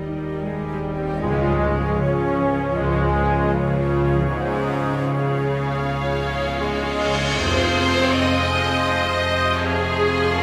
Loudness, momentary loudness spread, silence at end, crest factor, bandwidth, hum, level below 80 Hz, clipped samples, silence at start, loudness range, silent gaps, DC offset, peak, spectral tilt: -21 LUFS; 5 LU; 0 s; 14 dB; 12.5 kHz; none; -32 dBFS; under 0.1%; 0 s; 3 LU; none; under 0.1%; -6 dBFS; -6 dB/octave